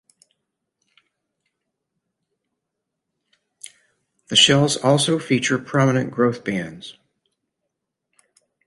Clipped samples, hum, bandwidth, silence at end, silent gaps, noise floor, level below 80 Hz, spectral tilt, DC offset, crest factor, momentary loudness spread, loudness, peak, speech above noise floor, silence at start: under 0.1%; none; 11.5 kHz; 1.75 s; none; -81 dBFS; -62 dBFS; -4 dB/octave; under 0.1%; 22 dB; 27 LU; -18 LUFS; -2 dBFS; 62 dB; 4.3 s